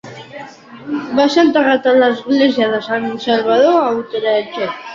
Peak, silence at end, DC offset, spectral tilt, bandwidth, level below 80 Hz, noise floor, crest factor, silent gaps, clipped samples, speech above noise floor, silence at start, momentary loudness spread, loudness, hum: -2 dBFS; 0 s; under 0.1%; -5 dB/octave; 7.6 kHz; -58 dBFS; -34 dBFS; 14 dB; none; under 0.1%; 21 dB; 0.05 s; 20 LU; -14 LUFS; none